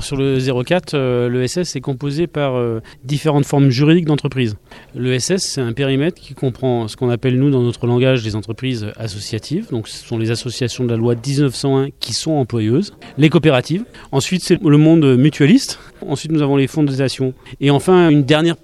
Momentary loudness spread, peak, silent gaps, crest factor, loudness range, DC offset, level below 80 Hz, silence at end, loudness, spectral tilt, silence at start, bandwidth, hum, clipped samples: 12 LU; 0 dBFS; none; 14 dB; 5 LU; under 0.1%; -46 dBFS; 0.1 s; -16 LUFS; -6 dB/octave; 0 s; 13.5 kHz; none; under 0.1%